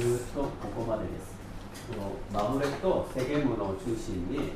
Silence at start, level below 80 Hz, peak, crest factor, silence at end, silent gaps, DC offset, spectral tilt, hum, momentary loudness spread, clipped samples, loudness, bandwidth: 0 s; -44 dBFS; -14 dBFS; 16 dB; 0 s; none; under 0.1%; -6.5 dB/octave; none; 12 LU; under 0.1%; -32 LUFS; 15.5 kHz